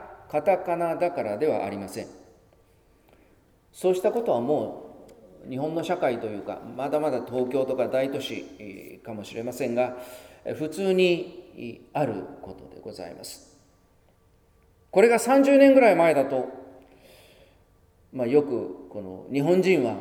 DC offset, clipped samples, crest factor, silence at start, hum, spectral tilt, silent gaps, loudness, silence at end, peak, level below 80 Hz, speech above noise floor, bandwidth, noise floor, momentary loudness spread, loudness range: under 0.1%; under 0.1%; 22 dB; 0 s; none; -6 dB/octave; none; -24 LUFS; 0 s; -4 dBFS; -64 dBFS; 37 dB; 18 kHz; -61 dBFS; 22 LU; 10 LU